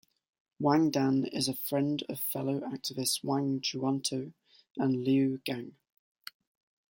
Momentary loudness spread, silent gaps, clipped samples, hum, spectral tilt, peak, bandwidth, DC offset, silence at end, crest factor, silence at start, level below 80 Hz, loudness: 18 LU; 4.70-4.75 s; under 0.1%; none; -5 dB/octave; -12 dBFS; 17 kHz; under 0.1%; 1.2 s; 20 dB; 0.6 s; -74 dBFS; -31 LUFS